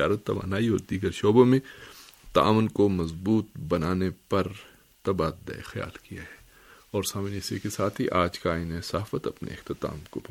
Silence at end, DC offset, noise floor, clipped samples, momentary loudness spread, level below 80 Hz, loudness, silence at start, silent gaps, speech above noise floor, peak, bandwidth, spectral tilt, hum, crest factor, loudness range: 0.1 s; under 0.1%; -54 dBFS; under 0.1%; 17 LU; -50 dBFS; -27 LUFS; 0 s; none; 28 dB; -6 dBFS; 17 kHz; -6 dB/octave; none; 22 dB; 8 LU